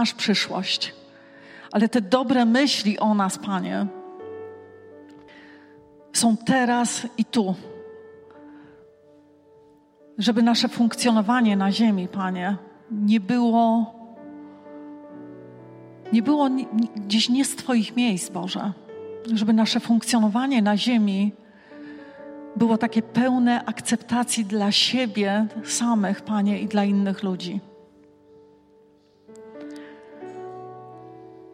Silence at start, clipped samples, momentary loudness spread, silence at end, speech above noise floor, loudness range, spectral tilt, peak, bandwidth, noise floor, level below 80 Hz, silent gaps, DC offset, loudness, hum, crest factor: 0 s; under 0.1%; 22 LU; 0.05 s; 35 dB; 7 LU; -4.5 dB/octave; -6 dBFS; 15.5 kHz; -56 dBFS; -72 dBFS; none; under 0.1%; -22 LUFS; none; 18 dB